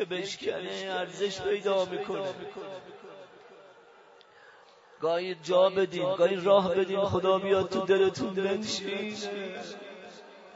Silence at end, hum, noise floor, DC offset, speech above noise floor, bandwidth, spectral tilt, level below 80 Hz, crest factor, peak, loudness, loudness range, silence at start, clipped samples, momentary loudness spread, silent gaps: 0 s; none; -56 dBFS; under 0.1%; 28 dB; 7.8 kHz; -4.5 dB/octave; -68 dBFS; 20 dB; -10 dBFS; -28 LUFS; 12 LU; 0 s; under 0.1%; 20 LU; none